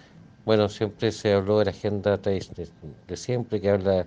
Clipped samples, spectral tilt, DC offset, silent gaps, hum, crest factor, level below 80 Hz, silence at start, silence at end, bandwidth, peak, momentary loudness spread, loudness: under 0.1%; -6.5 dB/octave; under 0.1%; none; none; 18 dB; -58 dBFS; 0.45 s; 0 s; 9.4 kHz; -6 dBFS; 16 LU; -25 LUFS